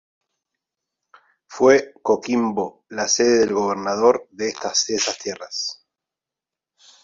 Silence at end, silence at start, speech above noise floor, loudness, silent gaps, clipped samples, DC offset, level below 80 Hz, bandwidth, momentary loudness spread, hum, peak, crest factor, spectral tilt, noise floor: 1.3 s; 1.5 s; 68 dB; -20 LUFS; none; under 0.1%; under 0.1%; -64 dBFS; 7.8 kHz; 12 LU; none; -2 dBFS; 20 dB; -2.5 dB/octave; -88 dBFS